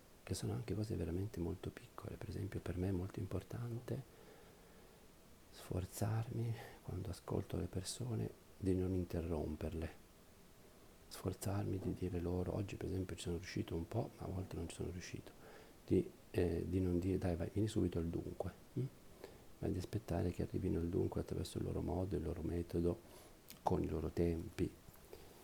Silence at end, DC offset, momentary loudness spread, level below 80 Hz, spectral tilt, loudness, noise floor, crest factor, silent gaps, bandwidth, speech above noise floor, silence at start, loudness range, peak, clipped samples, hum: 0 s; under 0.1%; 19 LU; -58 dBFS; -7 dB/octave; -42 LUFS; -63 dBFS; 22 dB; none; 20 kHz; 22 dB; 0 s; 6 LU; -20 dBFS; under 0.1%; none